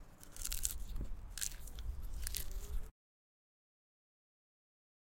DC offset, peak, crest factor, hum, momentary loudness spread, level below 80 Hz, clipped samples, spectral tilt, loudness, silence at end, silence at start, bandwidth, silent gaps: under 0.1%; -12 dBFS; 32 dB; none; 10 LU; -46 dBFS; under 0.1%; -2 dB/octave; -44 LUFS; 2.1 s; 0 s; 17 kHz; none